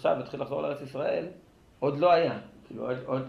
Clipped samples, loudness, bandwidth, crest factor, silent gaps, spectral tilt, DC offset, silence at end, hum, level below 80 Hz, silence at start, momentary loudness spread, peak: under 0.1%; -29 LUFS; 10.5 kHz; 18 dB; none; -7.5 dB/octave; under 0.1%; 0 s; none; -66 dBFS; 0 s; 16 LU; -12 dBFS